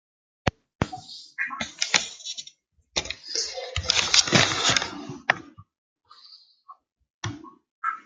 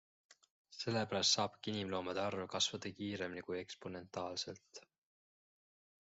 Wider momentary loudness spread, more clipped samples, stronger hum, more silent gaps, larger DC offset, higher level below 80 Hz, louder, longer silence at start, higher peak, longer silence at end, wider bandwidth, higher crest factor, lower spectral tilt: first, 18 LU vs 15 LU; neither; neither; first, 0.75-0.79 s, 5.78-5.96 s, 6.92-6.96 s, 7.14-7.21 s, 7.71-7.82 s vs 0.50-0.65 s; neither; first, -52 dBFS vs -82 dBFS; first, -24 LUFS vs -39 LUFS; first, 0.45 s vs 0.3 s; first, 0 dBFS vs -20 dBFS; second, 0.05 s vs 1.3 s; first, 13 kHz vs 8 kHz; first, 28 dB vs 22 dB; about the same, -1.5 dB/octave vs -2.5 dB/octave